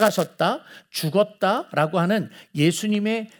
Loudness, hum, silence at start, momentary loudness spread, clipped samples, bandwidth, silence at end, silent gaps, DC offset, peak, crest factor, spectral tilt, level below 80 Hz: -23 LUFS; none; 0 s; 8 LU; under 0.1%; over 20 kHz; 0.15 s; none; under 0.1%; -4 dBFS; 18 dB; -5 dB/octave; -74 dBFS